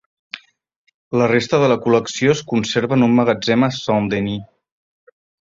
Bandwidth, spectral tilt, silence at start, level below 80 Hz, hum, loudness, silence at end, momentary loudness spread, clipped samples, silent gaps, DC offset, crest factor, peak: 7.8 kHz; -5.5 dB/octave; 0.35 s; -54 dBFS; none; -17 LUFS; 1.15 s; 15 LU; under 0.1%; 0.76-0.85 s, 0.94-1.11 s; under 0.1%; 16 dB; -2 dBFS